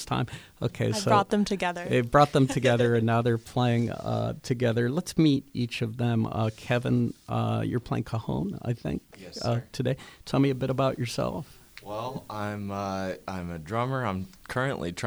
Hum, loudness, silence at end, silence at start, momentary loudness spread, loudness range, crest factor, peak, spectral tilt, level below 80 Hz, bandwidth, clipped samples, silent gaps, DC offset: none; -28 LUFS; 0 s; 0 s; 12 LU; 8 LU; 20 dB; -6 dBFS; -6.5 dB/octave; -52 dBFS; over 20 kHz; under 0.1%; none; under 0.1%